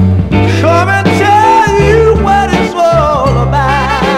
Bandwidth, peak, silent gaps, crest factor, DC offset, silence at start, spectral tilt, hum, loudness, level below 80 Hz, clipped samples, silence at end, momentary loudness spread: 13.5 kHz; 0 dBFS; none; 8 dB; under 0.1%; 0 s; -6.5 dB/octave; none; -8 LUFS; -22 dBFS; 0.2%; 0 s; 4 LU